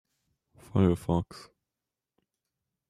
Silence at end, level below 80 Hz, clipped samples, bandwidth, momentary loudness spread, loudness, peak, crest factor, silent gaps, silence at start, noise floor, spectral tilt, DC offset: 1.45 s; -56 dBFS; under 0.1%; 13.5 kHz; 18 LU; -28 LUFS; -12 dBFS; 22 dB; none; 0.75 s; -89 dBFS; -8.5 dB/octave; under 0.1%